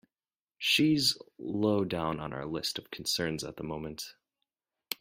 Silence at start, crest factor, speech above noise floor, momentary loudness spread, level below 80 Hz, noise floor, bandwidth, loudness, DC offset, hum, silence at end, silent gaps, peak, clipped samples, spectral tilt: 0.6 s; 20 dB; over 59 dB; 14 LU; -62 dBFS; under -90 dBFS; 16 kHz; -31 LUFS; under 0.1%; none; 0.05 s; none; -12 dBFS; under 0.1%; -4 dB/octave